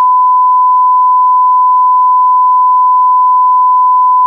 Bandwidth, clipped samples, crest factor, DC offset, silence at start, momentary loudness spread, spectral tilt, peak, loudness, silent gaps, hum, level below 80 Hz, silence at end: 1.2 kHz; under 0.1%; 4 dB; under 0.1%; 0 s; 0 LU; -3.5 dB/octave; -4 dBFS; -7 LUFS; none; none; under -90 dBFS; 0 s